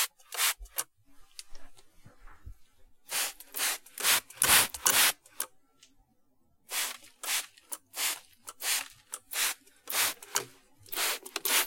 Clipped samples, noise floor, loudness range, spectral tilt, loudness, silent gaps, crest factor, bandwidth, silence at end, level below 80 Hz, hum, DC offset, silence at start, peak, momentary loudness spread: under 0.1%; -67 dBFS; 9 LU; 1.5 dB/octave; -29 LUFS; none; 30 dB; 17 kHz; 0 s; -60 dBFS; none; under 0.1%; 0 s; -2 dBFS; 20 LU